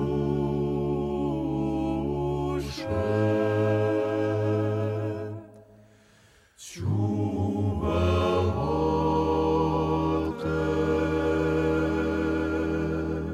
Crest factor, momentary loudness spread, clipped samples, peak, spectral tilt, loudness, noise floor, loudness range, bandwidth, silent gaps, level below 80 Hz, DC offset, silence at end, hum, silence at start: 14 dB; 5 LU; under 0.1%; -12 dBFS; -8 dB/octave; -27 LUFS; -58 dBFS; 5 LU; 13 kHz; none; -42 dBFS; under 0.1%; 0 s; none; 0 s